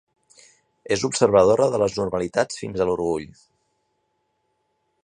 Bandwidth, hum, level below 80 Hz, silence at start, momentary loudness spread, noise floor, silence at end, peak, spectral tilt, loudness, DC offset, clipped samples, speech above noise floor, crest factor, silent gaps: 10.5 kHz; none; -52 dBFS; 0.9 s; 10 LU; -72 dBFS; 1.8 s; -2 dBFS; -4.5 dB/octave; -21 LUFS; under 0.1%; under 0.1%; 51 dB; 22 dB; none